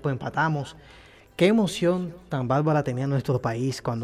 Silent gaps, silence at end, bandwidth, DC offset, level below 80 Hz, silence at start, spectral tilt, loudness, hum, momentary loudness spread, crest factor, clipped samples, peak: none; 0 s; 14 kHz; under 0.1%; -56 dBFS; 0 s; -6.5 dB/octave; -25 LUFS; none; 10 LU; 16 dB; under 0.1%; -8 dBFS